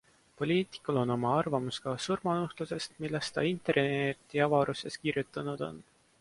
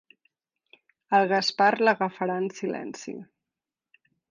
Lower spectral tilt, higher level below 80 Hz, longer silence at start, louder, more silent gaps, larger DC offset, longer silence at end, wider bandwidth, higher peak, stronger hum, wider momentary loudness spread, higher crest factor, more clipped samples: about the same, -5.5 dB/octave vs -4.5 dB/octave; first, -66 dBFS vs -78 dBFS; second, 0.4 s vs 1.1 s; second, -32 LUFS vs -25 LUFS; neither; neither; second, 0.4 s vs 1.05 s; first, 11.5 kHz vs 9.6 kHz; second, -14 dBFS vs -8 dBFS; neither; second, 9 LU vs 17 LU; about the same, 18 dB vs 20 dB; neither